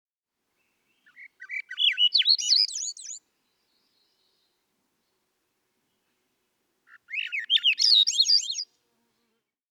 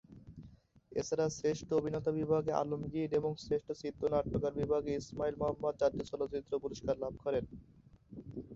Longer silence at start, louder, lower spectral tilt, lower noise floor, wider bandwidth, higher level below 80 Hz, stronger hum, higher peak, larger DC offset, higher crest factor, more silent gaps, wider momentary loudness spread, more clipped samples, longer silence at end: first, 1.2 s vs 0.1 s; first, -21 LUFS vs -36 LUFS; second, 7.5 dB/octave vs -7 dB/octave; first, -82 dBFS vs -60 dBFS; first, 17 kHz vs 7.8 kHz; second, under -90 dBFS vs -58 dBFS; neither; first, -10 dBFS vs -16 dBFS; neither; about the same, 20 dB vs 20 dB; neither; first, 18 LU vs 15 LU; neither; first, 1.05 s vs 0 s